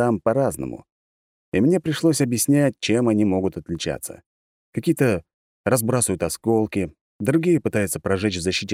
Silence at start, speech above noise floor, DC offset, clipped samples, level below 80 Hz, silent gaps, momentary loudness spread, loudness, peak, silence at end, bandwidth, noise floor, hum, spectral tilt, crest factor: 0 s; over 69 dB; under 0.1%; under 0.1%; -52 dBFS; 0.92-1.52 s, 4.26-4.73 s, 5.34-5.64 s, 7.01-7.19 s; 10 LU; -22 LUFS; -4 dBFS; 0 s; 16.5 kHz; under -90 dBFS; none; -5 dB/octave; 18 dB